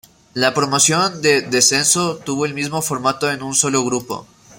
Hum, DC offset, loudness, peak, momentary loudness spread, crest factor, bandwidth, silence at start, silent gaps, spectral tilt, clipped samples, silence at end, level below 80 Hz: none; under 0.1%; -16 LUFS; 0 dBFS; 9 LU; 18 dB; 16.5 kHz; 0.35 s; none; -2.5 dB/octave; under 0.1%; 0.35 s; -58 dBFS